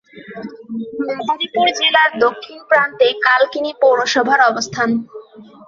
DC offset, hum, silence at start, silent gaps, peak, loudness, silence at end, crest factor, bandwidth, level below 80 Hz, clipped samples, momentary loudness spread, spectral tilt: under 0.1%; none; 0.15 s; none; 0 dBFS; -15 LUFS; 0.25 s; 16 dB; 7.6 kHz; -62 dBFS; under 0.1%; 19 LU; -2.5 dB/octave